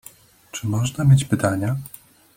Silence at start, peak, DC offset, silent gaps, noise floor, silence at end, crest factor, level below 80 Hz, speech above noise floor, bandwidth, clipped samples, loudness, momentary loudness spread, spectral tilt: 0.55 s; -4 dBFS; under 0.1%; none; -48 dBFS; 0.5 s; 18 dB; -50 dBFS; 29 dB; 16.5 kHz; under 0.1%; -21 LUFS; 15 LU; -6.5 dB/octave